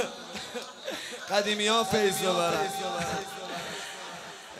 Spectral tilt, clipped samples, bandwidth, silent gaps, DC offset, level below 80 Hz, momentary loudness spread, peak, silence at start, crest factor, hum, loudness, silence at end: -2.5 dB/octave; under 0.1%; 16 kHz; none; under 0.1%; -66 dBFS; 14 LU; -12 dBFS; 0 s; 20 dB; none; -29 LUFS; 0 s